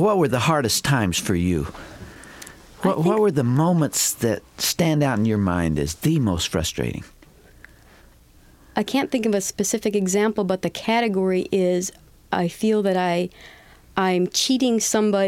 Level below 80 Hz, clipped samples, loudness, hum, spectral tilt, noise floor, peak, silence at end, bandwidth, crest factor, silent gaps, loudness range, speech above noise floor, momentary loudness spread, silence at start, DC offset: -46 dBFS; under 0.1%; -21 LUFS; none; -4.5 dB/octave; -51 dBFS; -6 dBFS; 0 s; 17 kHz; 16 dB; none; 5 LU; 30 dB; 10 LU; 0 s; under 0.1%